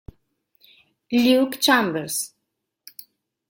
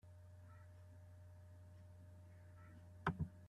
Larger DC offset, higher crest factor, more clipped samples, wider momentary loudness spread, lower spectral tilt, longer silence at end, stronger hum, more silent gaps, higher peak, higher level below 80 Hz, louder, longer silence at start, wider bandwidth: neither; second, 20 dB vs 28 dB; neither; first, 24 LU vs 16 LU; second, -3 dB/octave vs -7.5 dB/octave; first, 1.2 s vs 0 s; neither; neither; first, -4 dBFS vs -26 dBFS; first, -58 dBFS vs -70 dBFS; first, -20 LUFS vs -54 LUFS; first, 1.1 s vs 0.05 s; first, 17 kHz vs 13 kHz